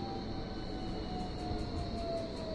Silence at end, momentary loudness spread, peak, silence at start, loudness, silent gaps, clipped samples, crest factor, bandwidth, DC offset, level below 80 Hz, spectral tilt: 0 s; 3 LU; -26 dBFS; 0 s; -40 LUFS; none; under 0.1%; 14 dB; 11.5 kHz; under 0.1%; -46 dBFS; -6.5 dB/octave